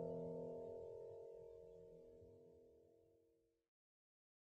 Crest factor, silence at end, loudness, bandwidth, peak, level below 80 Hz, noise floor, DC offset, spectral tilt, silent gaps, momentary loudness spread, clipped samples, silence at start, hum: 18 dB; 1.1 s; -55 LUFS; 8.2 kHz; -38 dBFS; -80 dBFS; -81 dBFS; under 0.1%; -9.5 dB/octave; none; 17 LU; under 0.1%; 0 s; none